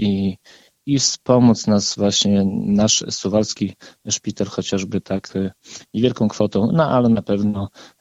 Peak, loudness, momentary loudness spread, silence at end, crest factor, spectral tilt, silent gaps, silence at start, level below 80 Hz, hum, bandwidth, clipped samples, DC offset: -2 dBFS; -19 LUFS; 12 LU; 0.15 s; 18 dB; -5 dB/octave; none; 0 s; -52 dBFS; none; 8.2 kHz; under 0.1%; under 0.1%